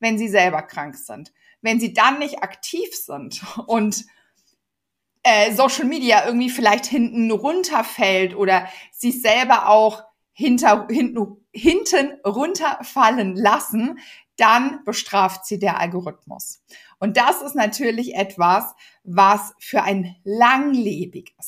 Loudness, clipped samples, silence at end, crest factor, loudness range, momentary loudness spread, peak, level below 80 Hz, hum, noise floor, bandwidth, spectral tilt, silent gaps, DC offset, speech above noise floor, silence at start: -18 LUFS; under 0.1%; 0 s; 18 dB; 5 LU; 15 LU; -2 dBFS; -58 dBFS; none; -81 dBFS; 15.5 kHz; -3.5 dB/octave; none; under 0.1%; 62 dB; 0 s